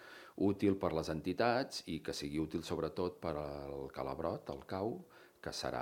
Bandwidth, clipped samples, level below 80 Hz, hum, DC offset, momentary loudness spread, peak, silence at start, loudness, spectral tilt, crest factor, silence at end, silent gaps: 17 kHz; under 0.1%; -62 dBFS; none; under 0.1%; 11 LU; -16 dBFS; 0 s; -39 LUFS; -5.5 dB/octave; 22 dB; 0 s; none